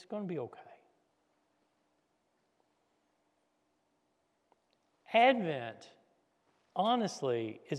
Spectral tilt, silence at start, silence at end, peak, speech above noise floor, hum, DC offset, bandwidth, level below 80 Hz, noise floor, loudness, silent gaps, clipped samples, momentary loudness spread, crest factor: -5 dB/octave; 0.1 s; 0 s; -14 dBFS; 45 dB; none; under 0.1%; 11.5 kHz; under -90 dBFS; -78 dBFS; -32 LUFS; none; under 0.1%; 15 LU; 24 dB